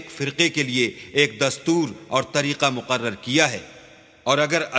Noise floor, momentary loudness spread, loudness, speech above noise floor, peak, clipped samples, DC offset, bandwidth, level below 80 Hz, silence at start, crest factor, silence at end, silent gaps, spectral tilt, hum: -48 dBFS; 5 LU; -21 LUFS; 26 dB; 0 dBFS; under 0.1%; under 0.1%; 8 kHz; -62 dBFS; 0 s; 22 dB; 0 s; none; -3.5 dB/octave; none